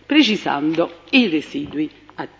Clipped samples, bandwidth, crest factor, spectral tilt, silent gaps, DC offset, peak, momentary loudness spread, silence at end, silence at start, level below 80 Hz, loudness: under 0.1%; 7.8 kHz; 18 dB; -4.5 dB/octave; none; under 0.1%; 0 dBFS; 12 LU; 0.15 s; 0.1 s; -58 dBFS; -19 LUFS